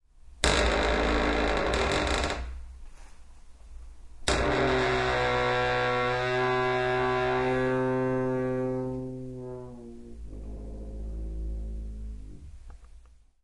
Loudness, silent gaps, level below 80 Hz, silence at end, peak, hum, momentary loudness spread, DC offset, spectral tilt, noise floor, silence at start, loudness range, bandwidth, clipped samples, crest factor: -27 LUFS; none; -38 dBFS; 0.4 s; -6 dBFS; none; 17 LU; under 0.1%; -4.5 dB/octave; -53 dBFS; 0.15 s; 14 LU; 11.5 kHz; under 0.1%; 22 dB